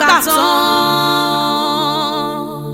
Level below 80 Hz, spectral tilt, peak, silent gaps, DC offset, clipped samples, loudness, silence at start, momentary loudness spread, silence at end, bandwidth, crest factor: -52 dBFS; -3 dB/octave; 0 dBFS; none; under 0.1%; under 0.1%; -14 LUFS; 0 s; 8 LU; 0 s; 17 kHz; 14 dB